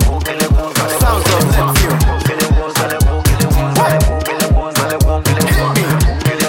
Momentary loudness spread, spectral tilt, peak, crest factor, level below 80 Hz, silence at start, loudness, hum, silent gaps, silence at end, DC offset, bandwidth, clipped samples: 3 LU; -5 dB/octave; -2 dBFS; 10 dB; -16 dBFS; 0 s; -13 LUFS; none; none; 0 s; under 0.1%; 17 kHz; under 0.1%